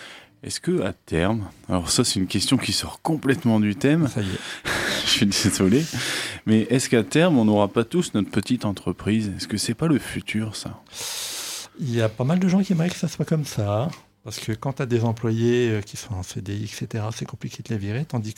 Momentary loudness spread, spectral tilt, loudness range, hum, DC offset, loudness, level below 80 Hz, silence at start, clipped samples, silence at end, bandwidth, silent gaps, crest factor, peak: 11 LU; -5 dB/octave; 5 LU; none; under 0.1%; -23 LUFS; -52 dBFS; 0 s; under 0.1%; 0.05 s; 16.5 kHz; none; 20 dB; -4 dBFS